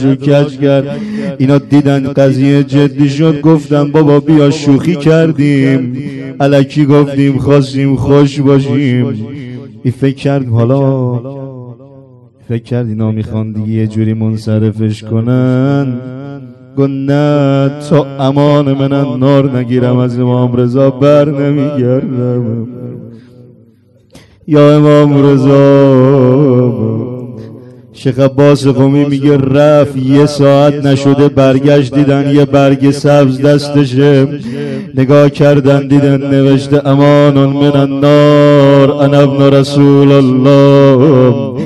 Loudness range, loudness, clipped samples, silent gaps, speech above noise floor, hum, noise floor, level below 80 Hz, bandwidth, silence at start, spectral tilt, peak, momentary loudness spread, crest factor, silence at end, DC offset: 7 LU; -9 LUFS; 4%; none; 37 dB; none; -45 dBFS; -44 dBFS; 10.5 kHz; 0 s; -8 dB/octave; 0 dBFS; 12 LU; 8 dB; 0 s; under 0.1%